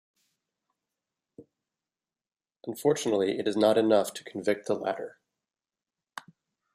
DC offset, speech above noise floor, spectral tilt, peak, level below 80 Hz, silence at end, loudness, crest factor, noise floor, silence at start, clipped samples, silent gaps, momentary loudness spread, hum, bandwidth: under 0.1%; over 63 dB; -4.5 dB/octave; -8 dBFS; -78 dBFS; 0.55 s; -27 LUFS; 22 dB; under -90 dBFS; 1.4 s; under 0.1%; none; 22 LU; none; 15 kHz